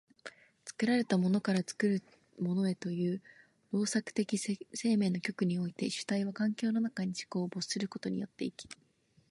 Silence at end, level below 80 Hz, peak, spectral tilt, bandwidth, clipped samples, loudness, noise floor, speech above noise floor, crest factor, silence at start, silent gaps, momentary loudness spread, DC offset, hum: 0.55 s; -76 dBFS; -16 dBFS; -5.5 dB/octave; 11.5 kHz; under 0.1%; -34 LUFS; -54 dBFS; 21 dB; 18 dB; 0.25 s; none; 11 LU; under 0.1%; none